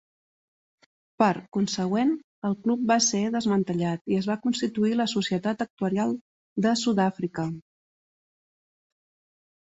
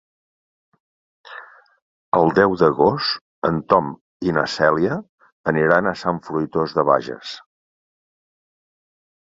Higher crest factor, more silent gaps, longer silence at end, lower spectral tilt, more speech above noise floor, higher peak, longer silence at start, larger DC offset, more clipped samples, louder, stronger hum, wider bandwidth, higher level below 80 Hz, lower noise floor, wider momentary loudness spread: about the same, 20 dB vs 20 dB; second, 1.48-1.52 s, 2.24-2.42 s, 4.01-4.05 s, 5.70-5.77 s, 6.21-6.56 s vs 1.82-2.12 s, 3.21-3.42 s, 4.01-4.20 s, 5.09-5.18 s, 5.32-5.44 s; about the same, 2.05 s vs 1.95 s; second, -4.5 dB/octave vs -6.5 dB/octave; first, over 65 dB vs 23 dB; second, -6 dBFS vs -2 dBFS; about the same, 1.2 s vs 1.3 s; neither; neither; second, -26 LUFS vs -19 LUFS; neither; about the same, 8.2 kHz vs 7.8 kHz; second, -66 dBFS vs -54 dBFS; first, under -90 dBFS vs -42 dBFS; second, 7 LU vs 17 LU